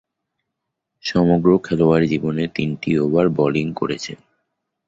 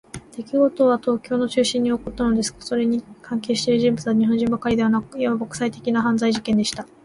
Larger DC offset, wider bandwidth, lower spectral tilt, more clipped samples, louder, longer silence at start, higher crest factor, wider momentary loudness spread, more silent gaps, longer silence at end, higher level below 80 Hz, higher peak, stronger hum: neither; second, 7.8 kHz vs 11.5 kHz; first, -7 dB/octave vs -5 dB/octave; neither; about the same, -19 LUFS vs -21 LUFS; first, 1.05 s vs 0.15 s; about the same, 18 dB vs 14 dB; about the same, 9 LU vs 7 LU; neither; first, 0.7 s vs 0.2 s; about the same, -48 dBFS vs -50 dBFS; first, -2 dBFS vs -6 dBFS; neither